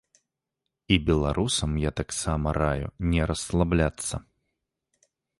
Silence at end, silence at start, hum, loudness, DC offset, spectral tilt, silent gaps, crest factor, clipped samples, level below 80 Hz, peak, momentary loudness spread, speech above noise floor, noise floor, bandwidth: 1.2 s; 0.9 s; none; -26 LUFS; under 0.1%; -5 dB/octave; none; 20 dB; under 0.1%; -36 dBFS; -6 dBFS; 6 LU; 59 dB; -84 dBFS; 11.5 kHz